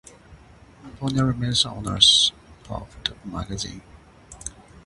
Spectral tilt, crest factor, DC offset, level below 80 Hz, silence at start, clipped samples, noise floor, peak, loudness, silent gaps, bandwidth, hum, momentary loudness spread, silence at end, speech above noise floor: -3 dB/octave; 26 dB; under 0.1%; -46 dBFS; 0.3 s; under 0.1%; -49 dBFS; 0 dBFS; -20 LUFS; none; 11.5 kHz; none; 23 LU; 0.05 s; 26 dB